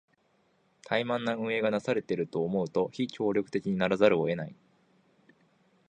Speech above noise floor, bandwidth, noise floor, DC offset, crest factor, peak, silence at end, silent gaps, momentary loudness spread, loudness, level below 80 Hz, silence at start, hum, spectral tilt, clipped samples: 41 dB; 9.4 kHz; -70 dBFS; under 0.1%; 22 dB; -8 dBFS; 1.35 s; none; 8 LU; -29 LUFS; -68 dBFS; 0.85 s; none; -6.5 dB/octave; under 0.1%